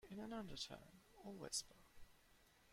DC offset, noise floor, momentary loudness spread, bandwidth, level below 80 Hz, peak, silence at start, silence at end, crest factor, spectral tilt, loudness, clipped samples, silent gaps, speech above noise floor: under 0.1%; -72 dBFS; 18 LU; 16.5 kHz; -72 dBFS; -32 dBFS; 0 s; 0 s; 22 dB; -2.5 dB/octave; -51 LUFS; under 0.1%; none; 20 dB